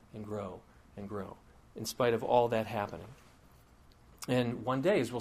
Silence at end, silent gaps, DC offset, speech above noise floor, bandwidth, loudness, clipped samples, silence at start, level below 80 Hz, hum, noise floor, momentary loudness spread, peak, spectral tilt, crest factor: 0 s; none; under 0.1%; 27 dB; 15.5 kHz; -33 LUFS; under 0.1%; 0.15 s; -62 dBFS; none; -60 dBFS; 20 LU; -14 dBFS; -5.5 dB/octave; 20 dB